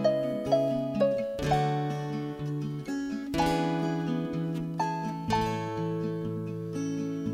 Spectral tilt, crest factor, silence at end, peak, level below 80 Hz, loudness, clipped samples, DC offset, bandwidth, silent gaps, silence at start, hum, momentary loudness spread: -7 dB/octave; 18 dB; 0 s; -12 dBFS; -52 dBFS; -30 LUFS; under 0.1%; under 0.1%; 16 kHz; none; 0 s; none; 7 LU